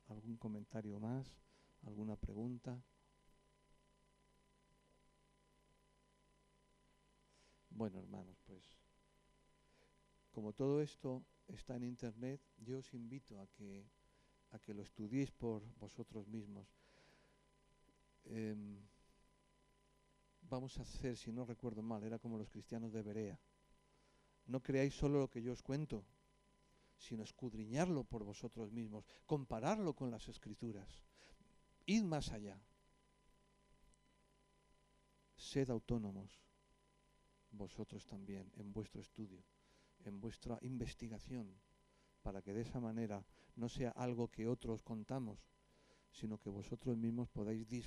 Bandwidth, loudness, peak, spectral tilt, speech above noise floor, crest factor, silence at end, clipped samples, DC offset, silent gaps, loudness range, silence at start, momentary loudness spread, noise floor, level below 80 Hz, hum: 12 kHz; -47 LUFS; -24 dBFS; -7 dB/octave; 30 dB; 24 dB; 0 s; under 0.1%; under 0.1%; none; 12 LU; 0.05 s; 17 LU; -76 dBFS; -64 dBFS; 50 Hz at -75 dBFS